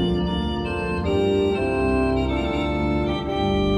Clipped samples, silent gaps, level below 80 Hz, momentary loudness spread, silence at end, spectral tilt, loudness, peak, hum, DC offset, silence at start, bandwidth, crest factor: under 0.1%; none; -32 dBFS; 4 LU; 0 s; -7.5 dB/octave; -23 LUFS; -10 dBFS; none; under 0.1%; 0 s; 11.5 kHz; 12 dB